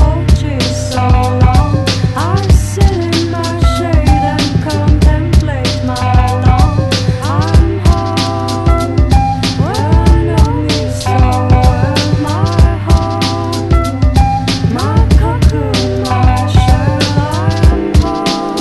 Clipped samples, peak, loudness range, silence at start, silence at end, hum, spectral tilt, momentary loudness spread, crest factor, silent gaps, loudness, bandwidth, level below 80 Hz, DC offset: 0.6%; 0 dBFS; 1 LU; 0 s; 0 s; none; -6 dB/octave; 4 LU; 10 dB; none; -12 LUFS; 12.5 kHz; -14 dBFS; under 0.1%